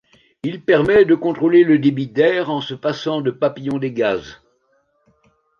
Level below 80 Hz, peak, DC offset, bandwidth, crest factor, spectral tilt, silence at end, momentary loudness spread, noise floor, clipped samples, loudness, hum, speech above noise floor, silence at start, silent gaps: -54 dBFS; -2 dBFS; under 0.1%; 7 kHz; 16 dB; -7.5 dB/octave; 1.25 s; 11 LU; -63 dBFS; under 0.1%; -17 LUFS; none; 47 dB; 0.45 s; none